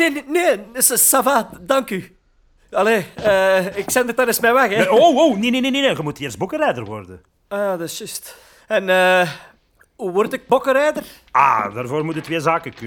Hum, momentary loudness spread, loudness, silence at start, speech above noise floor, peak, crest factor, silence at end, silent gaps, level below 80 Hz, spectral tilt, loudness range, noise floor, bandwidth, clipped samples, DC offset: none; 15 LU; -17 LUFS; 0 s; 38 dB; 0 dBFS; 18 dB; 0 s; none; -54 dBFS; -3 dB/octave; 5 LU; -56 dBFS; over 20 kHz; under 0.1%; under 0.1%